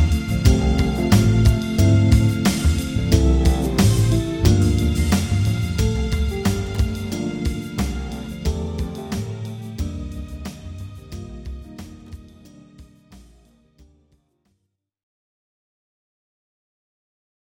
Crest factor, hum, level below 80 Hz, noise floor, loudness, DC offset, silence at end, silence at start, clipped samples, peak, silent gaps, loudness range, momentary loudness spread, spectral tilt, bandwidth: 20 dB; none; -26 dBFS; -74 dBFS; -20 LUFS; under 0.1%; 4.3 s; 0 s; under 0.1%; -2 dBFS; none; 20 LU; 19 LU; -6 dB/octave; 18 kHz